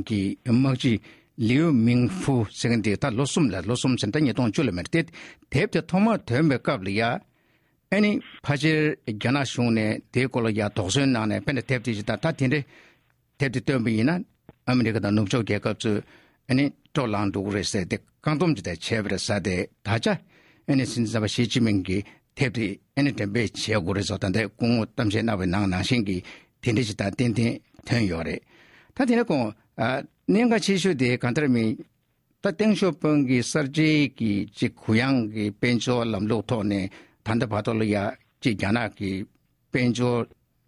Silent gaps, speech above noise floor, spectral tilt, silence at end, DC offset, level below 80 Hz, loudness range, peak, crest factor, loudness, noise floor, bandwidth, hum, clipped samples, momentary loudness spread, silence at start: none; 46 dB; -6 dB/octave; 0.4 s; under 0.1%; -50 dBFS; 3 LU; -8 dBFS; 16 dB; -25 LUFS; -70 dBFS; 12 kHz; none; under 0.1%; 8 LU; 0 s